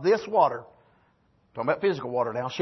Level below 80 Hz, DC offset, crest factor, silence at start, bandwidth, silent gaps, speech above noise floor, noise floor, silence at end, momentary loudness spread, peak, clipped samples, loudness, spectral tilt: -70 dBFS; under 0.1%; 20 dB; 0 s; 6.2 kHz; none; 40 dB; -65 dBFS; 0 s; 12 LU; -8 dBFS; under 0.1%; -26 LUFS; -6 dB/octave